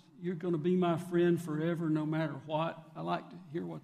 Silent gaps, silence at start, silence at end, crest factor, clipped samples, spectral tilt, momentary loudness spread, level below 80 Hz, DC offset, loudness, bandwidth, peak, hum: none; 0.2 s; 0 s; 14 dB; under 0.1%; -8 dB/octave; 11 LU; -76 dBFS; under 0.1%; -34 LUFS; 14.5 kHz; -20 dBFS; none